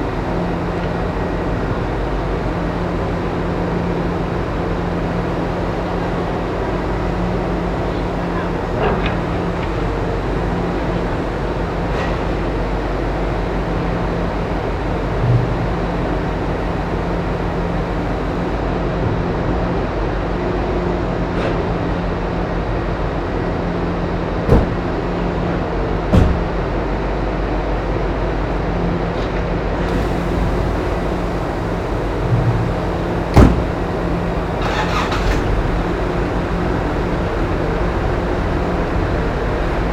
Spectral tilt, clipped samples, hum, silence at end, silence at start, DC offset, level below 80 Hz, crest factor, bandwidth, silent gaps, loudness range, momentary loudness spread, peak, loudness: -7.5 dB/octave; under 0.1%; none; 0 s; 0 s; under 0.1%; -24 dBFS; 18 dB; 9.4 kHz; none; 3 LU; 3 LU; 0 dBFS; -20 LUFS